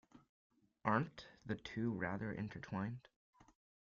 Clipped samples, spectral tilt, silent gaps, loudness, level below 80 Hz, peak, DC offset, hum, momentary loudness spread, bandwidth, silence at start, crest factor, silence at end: under 0.1%; -6 dB/octave; 0.29-0.50 s, 3.16-3.33 s; -43 LUFS; -72 dBFS; -22 dBFS; under 0.1%; none; 10 LU; 7.2 kHz; 0.15 s; 24 dB; 0.45 s